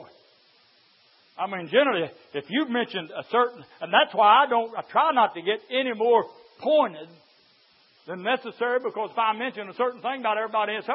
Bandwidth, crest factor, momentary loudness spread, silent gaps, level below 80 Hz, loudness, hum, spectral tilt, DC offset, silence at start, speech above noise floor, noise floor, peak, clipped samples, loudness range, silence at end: 5.8 kHz; 20 dB; 13 LU; none; -86 dBFS; -24 LUFS; none; -8 dB/octave; under 0.1%; 0 s; 36 dB; -60 dBFS; -4 dBFS; under 0.1%; 6 LU; 0 s